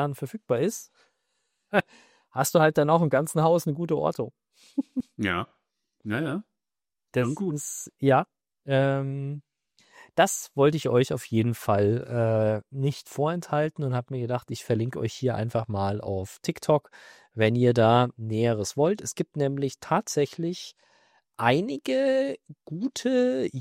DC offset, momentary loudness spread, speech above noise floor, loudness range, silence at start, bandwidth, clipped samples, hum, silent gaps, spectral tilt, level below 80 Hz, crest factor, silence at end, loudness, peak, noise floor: under 0.1%; 12 LU; over 65 dB; 5 LU; 0 s; 16 kHz; under 0.1%; none; none; -6 dB/octave; -66 dBFS; 20 dB; 0 s; -26 LUFS; -6 dBFS; under -90 dBFS